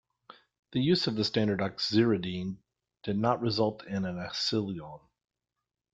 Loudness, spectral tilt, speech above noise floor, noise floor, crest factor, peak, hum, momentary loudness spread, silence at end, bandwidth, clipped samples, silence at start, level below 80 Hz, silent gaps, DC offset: -30 LUFS; -6 dB/octave; 28 dB; -57 dBFS; 20 dB; -12 dBFS; none; 13 LU; 0.95 s; 9 kHz; under 0.1%; 0.3 s; -64 dBFS; 0.59-0.63 s; under 0.1%